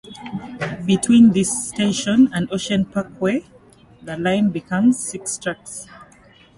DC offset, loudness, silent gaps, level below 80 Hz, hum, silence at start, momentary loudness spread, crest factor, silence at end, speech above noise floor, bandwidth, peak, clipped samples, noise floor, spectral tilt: under 0.1%; -19 LUFS; none; -54 dBFS; none; 0.1 s; 18 LU; 16 dB; 0.55 s; 31 dB; 11.5 kHz; -2 dBFS; under 0.1%; -49 dBFS; -5 dB/octave